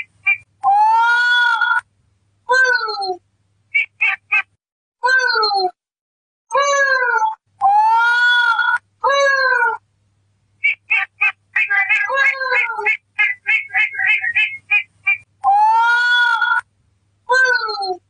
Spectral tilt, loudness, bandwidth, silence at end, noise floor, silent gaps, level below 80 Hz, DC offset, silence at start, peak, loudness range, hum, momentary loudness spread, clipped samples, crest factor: 0.5 dB/octave; -15 LUFS; 10 kHz; 0.1 s; -62 dBFS; 4.72-4.92 s, 6.01-6.45 s; -70 dBFS; under 0.1%; 0 s; -4 dBFS; 3 LU; none; 7 LU; under 0.1%; 12 dB